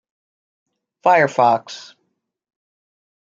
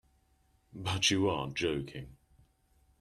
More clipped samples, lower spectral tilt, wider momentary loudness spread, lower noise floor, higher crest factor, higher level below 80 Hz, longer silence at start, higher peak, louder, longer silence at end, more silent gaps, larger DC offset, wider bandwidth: neither; first, -5 dB/octave vs -3.5 dB/octave; first, 21 LU vs 18 LU; about the same, -73 dBFS vs -70 dBFS; about the same, 20 dB vs 22 dB; second, -74 dBFS vs -60 dBFS; first, 1.05 s vs 0.75 s; first, -2 dBFS vs -14 dBFS; first, -16 LUFS vs -31 LUFS; first, 1.6 s vs 0.85 s; neither; neither; second, 7.6 kHz vs 13 kHz